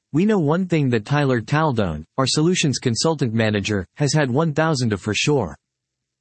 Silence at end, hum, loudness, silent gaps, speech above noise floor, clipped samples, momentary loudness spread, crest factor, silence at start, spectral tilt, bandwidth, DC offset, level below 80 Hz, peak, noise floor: 0.65 s; none; -20 LUFS; none; 61 dB; under 0.1%; 4 LU; 14 dB; 0.15 s; -5 dB/octave; 8.8 kHz; under 0.1%; -52 dBFS; -6 dBFS; -80 dBFS